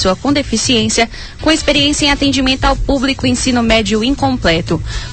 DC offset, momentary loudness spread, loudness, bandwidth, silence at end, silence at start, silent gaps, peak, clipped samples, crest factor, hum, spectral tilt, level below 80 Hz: 0.9%; 4 LU; -13 LUFS; 9 kHz; 0 s; 0 s; none; 0 dBFS; under 0.1%; 14 dB; none; -3.5 dB/octave; -26 dBFS